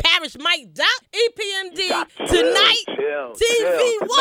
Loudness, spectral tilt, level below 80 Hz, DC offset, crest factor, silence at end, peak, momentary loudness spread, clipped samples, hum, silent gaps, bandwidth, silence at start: -18 LUFS; -1.5 dB/octave; -44 dBFS; under 0.1%; 18 dB; 0 s; 0 dBFS; 10 LU; under 0.1%; none; none; 16.5 kHz; 0 s